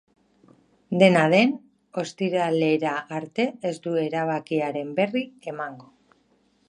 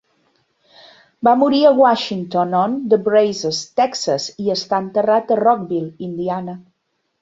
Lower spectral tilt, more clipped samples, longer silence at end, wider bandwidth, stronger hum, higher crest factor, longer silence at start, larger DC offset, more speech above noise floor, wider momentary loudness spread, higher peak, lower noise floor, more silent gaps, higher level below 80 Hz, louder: about the same, -6 dB/octave vs -5 dB/octave; neither; first, 0.85 s vs 0.6 s; first, 11 kHz vs 8 kHz; neither; first, 22 dB vs 16 dB; second, 0.9 s vs 1.2 s; neither; second, 41 dB vs 54 dB; first, 15 LU vs 11 LU; about the same, -2 dBFS vs -2 dBFS; second, -64 dBFS vs -70 dBFS; neither; second, -74 dBFS vs -62 dBFS; second, -24 LUFS vs -17 LUFS